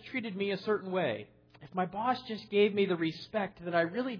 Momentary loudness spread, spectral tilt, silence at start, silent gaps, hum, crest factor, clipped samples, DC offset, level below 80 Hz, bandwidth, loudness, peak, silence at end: 8 LU; -4 dB/octave; 0 s; none; none; 16 dB; under 0.1%; under 0.1%; -72 dBFS; 5.4 kHz; -32 LUFS; -16 dBFS; 0 s